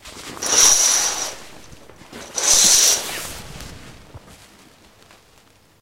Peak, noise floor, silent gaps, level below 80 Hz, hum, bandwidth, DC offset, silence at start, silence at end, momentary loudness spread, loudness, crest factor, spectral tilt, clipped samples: 0 dBFS; -53 dBFS; none; -48 dBFS; none; 16.5 kHz; under 0.1%; 0.05 s; 1.65 s; 26 LU; -14 LUFS; 20 dB; 1 dB/octave; under 0.1%